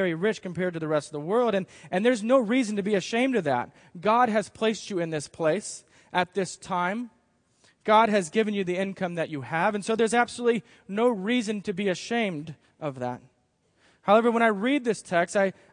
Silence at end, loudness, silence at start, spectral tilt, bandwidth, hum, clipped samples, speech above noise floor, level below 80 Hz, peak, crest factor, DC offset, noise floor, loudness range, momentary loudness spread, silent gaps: 0.2 s; -26 LUFS; 0 s; -5 dB/octave; 10.5 kHz; none; under 0.1%; 43 dB; -72 dBFS; -6 dBFS; 20 dB; under 0.1%; -69 dBFS; 4 LU; 11 LU; none